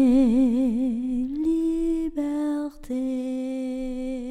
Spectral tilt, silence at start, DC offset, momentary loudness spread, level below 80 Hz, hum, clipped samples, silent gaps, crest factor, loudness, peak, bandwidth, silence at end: -7 dB/octave; 0 s; under 0.1%; 11 LU; -42 dBFS; none; under 0.1%; none; 14 dB; -25 LUFS; -10 dBFS; 10 kHz; 0 s